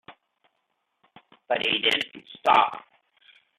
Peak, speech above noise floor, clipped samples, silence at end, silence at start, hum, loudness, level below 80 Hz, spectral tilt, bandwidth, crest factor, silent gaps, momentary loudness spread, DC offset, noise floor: -6 dBFS; 52 dB; under 0.1%; 0.8 s; 0.1 s; none; -23 LUFS; -74 dBFS; -2.5 dB/octave; 13.5 kHz; 22 dB; none; 12 LU; under 0.1%; -76 dBFS